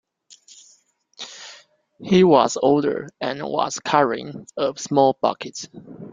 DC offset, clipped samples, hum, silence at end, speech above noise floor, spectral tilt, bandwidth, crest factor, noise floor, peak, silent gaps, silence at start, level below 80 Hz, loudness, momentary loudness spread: under 0.1%; under 0.1%; none; 0 s; 38 dB; -5 dB/octave; 9.4 kHz; 20 dB; -58 dBFS; -2 dBFS; none; 1.2 s; -62 dBFS; -20 LUFS; 22 LU